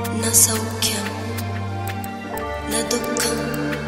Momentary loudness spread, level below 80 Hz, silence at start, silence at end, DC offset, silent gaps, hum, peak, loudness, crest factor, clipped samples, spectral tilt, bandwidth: 14 LU; -42 dBFS; 0 s; 0 s; under 0.1%; none; none; 0 dBFS; -21 LUFS; 22 dB; under 0.1%; -3 dB/octave; 16.5 kHz